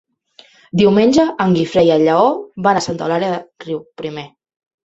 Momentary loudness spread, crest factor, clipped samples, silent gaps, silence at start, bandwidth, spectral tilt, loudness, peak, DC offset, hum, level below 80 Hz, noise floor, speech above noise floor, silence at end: 15 LU; 16 dB; under 0.1%; none; 0.75 s; 8.2 kHz; -6 dB/octave; -15 LUFS; 0 dBFS; under 0.1%; none; -52 dBFS; -48 dBFS; 34 dB; 0.6 s